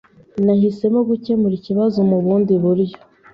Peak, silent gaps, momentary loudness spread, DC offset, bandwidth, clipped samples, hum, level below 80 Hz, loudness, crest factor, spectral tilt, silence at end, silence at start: -4 dBFS; none; 4 LU; under 0.1%; 5.8 kHz; under 0.1%; none; -56 dBFS; -17 LUFS; 12 dB; -11 dB/octave; 0.4 s; 0.35 s